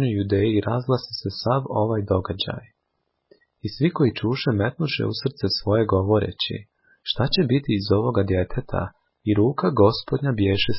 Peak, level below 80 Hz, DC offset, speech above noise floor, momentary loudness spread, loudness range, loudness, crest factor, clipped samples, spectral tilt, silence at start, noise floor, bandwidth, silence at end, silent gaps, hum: -6 dBFS; -42 dBFS; under 0.1%; 53 dB; 9 LU; 3 LU; -23 LUFS; 18 dB; under 0.1%; -10.5 dB/octave; 0 s; -75 dBFS; 5.8 kHz; 0 s; none; none